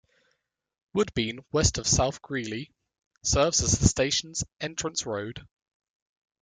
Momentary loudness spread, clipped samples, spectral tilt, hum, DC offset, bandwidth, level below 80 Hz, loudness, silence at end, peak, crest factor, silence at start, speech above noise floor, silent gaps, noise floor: 12 LU; under 0.1%; -3.5 dB/octave; none; under 0.1%; 10.5 kHz; -42 dBFS; -26 LUFS; 1 s; -4 dBFS; 26 dB; 0.95 s; 49 dB; 3.06-3.11 s; -76 dBFS